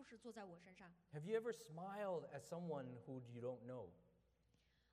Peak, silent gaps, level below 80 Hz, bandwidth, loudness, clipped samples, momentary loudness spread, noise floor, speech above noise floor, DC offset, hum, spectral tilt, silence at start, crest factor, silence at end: -32 dBFS; none; -86 dBFS; 13.5 kHz; -51 LUFS; under 0.1%; 15 LU; -80 dBFS; 29 dB; under 0.1%; none; -6.5 dB/octave; 0 s; 20 dB; 0.85 s